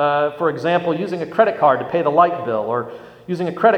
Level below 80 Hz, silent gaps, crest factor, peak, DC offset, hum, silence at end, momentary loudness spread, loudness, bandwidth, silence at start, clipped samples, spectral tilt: -62 dBFS; none; 18 dB; 0 dBFS; under 0.1%; none; 0 s; 10 LU; -19 LUFS; 8.8 kHz; 0 s; under 0.1%; -7.5 dB/octave